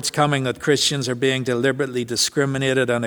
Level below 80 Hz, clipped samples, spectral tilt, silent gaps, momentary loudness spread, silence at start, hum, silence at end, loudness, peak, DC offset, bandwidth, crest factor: -56 dBFS; under 0.1%; -4 dB/octave; none; 3 LU; 0 s; none; 0 s; -20 LUFS; -2 dBFS; under 0.1%; over 20 kHz; 18 dB